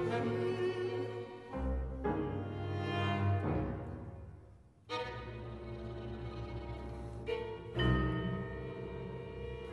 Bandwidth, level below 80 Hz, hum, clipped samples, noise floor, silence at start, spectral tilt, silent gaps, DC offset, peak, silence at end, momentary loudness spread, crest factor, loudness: 11 kHz; -48 dBFS; none; under 0.1%; -58 dBFS; 0 s; -8 dB/octave; none; under 0.1%; -20 dBFS; 0 s; 12 LU; 18 dB; -39 LUFS